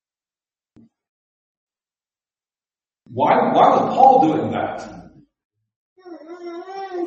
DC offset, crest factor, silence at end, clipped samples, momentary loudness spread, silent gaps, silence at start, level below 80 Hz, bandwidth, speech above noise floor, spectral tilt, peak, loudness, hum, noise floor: under 0.1%; 20 dB; 0 s; under 0.1%; 22 LU; 5.45-5.50 s, 5.76-5.96 s; 3.1 s; -64 dBFS; 7.4 kHz; over 75 dB; -7 dB/octave; 0 dBFS; -16 LUFS; none; under -90 dBFS